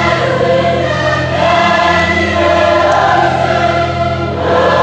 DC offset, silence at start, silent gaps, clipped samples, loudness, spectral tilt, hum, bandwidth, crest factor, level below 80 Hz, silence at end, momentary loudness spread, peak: under 0.1%; 0 s; none; under 0.1%; -11 LUFS; -5.5 dB/octave; none; 9 kHz; 10 dB; -40 dBFS; 0 s; 4 LU; 0 dBFS